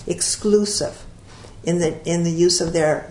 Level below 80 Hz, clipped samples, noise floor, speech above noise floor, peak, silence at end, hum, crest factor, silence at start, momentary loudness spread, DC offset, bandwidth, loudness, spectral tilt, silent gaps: -44 dBFS; under 0.1%; -41 dBFS; 21 dB; -4 dBFS; 0 s; none; 16 dB; 0 s; 7 LU; under 0.1%; 11 kHz; -20 LUFS; -4 dB/octave; none